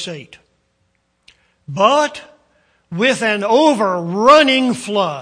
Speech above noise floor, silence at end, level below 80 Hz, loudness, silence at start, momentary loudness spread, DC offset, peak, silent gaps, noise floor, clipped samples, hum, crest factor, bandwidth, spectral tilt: 50 dB; 0 s; -58 dBFS; -14 LUFS; 0 s; 20 LU; under 0.1%; 0 dBFS; none; -65 dBFS; under 0.1%; none; 16 dB; 10.5 kHz; -4 dB/octave